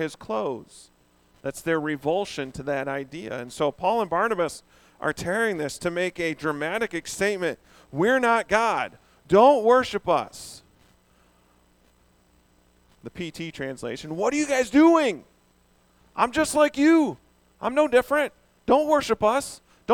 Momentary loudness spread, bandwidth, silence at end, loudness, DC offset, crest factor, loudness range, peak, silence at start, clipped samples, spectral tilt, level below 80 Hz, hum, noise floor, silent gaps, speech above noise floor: 17 LU; 17 kHz; 0 s; -24 LUFS; under 0.1%; 20 dB; 10 LU; -4 dBFS; 0 s; under 0.1%; -4.5 dB/octave; -58 dBFS; none; -62 dBFS; none; 38 dB